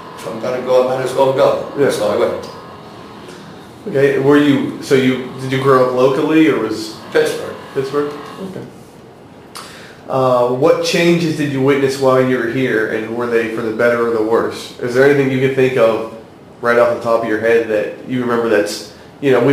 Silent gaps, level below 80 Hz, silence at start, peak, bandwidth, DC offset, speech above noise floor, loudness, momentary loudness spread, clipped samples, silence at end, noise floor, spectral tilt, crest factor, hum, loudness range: none; -56 dBFS; 0 s; 0 dBFS; 16 kHz; under 0.1%; 24 dB; -15 LUFS; 19 LU; under 0.1%; 0 s; -39 dBFS; -6 dB/octave; 16 dB; none; 4 LU